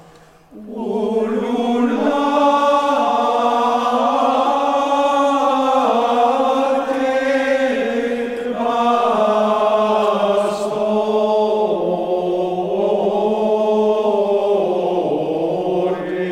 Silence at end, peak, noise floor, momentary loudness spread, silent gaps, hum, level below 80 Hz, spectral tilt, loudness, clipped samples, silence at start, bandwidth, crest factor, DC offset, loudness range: 0 s; -4 dBFS; -46 dBFS; 4 LU; none; none; -58 dBFS; -5.5 dB/octave; -17 LUFS; under 0.1%; 0.5 s; 14 kHz; 14 dB; under 0.1%; 2 LU